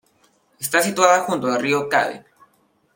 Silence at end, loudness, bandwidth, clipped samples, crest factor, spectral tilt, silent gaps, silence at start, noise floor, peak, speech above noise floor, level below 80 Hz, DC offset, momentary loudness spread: 0.75 s; -19 LUFS; 17 kHz; under 0.1%; 20 dB; -3 dB/octave; none; 0.6 s; -62 dBFS; -2 dBFS; 43 dB; -68 dBFS; under 0.1%; 11 LU